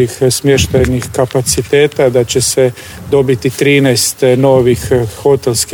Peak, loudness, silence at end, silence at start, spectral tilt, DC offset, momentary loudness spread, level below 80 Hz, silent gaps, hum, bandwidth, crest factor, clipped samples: 0 dBFS; -11 LUFS; 0 s; 0 s; -4.5 dB/octave; under 0.1%; 5 LU; -32 dBFS; none; none; 19.5 kHz; 10 dB; under 0.1%